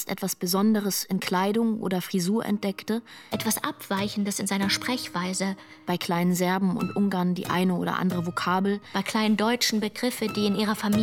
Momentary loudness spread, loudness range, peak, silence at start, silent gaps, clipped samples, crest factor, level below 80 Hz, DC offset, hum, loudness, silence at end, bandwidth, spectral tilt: 6 LU; 2 LU; -8 dBFS; 0 s; none; under 0.1%; 18 dB; -64 dBFS; under 0.1%; none; -26 LUFS; 0 s; 18 kHz; -4.5 dB/octave